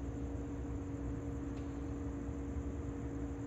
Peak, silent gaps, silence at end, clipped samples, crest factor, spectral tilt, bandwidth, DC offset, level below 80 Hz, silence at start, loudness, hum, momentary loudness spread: -30 dBFS; none; 0 s; under 0.1%; 12 dB; -8.5 dB/octave; 8.2 kHz; under 0.1%; -46 dBFS; 0 s; -43 LUFS; none; 1 LU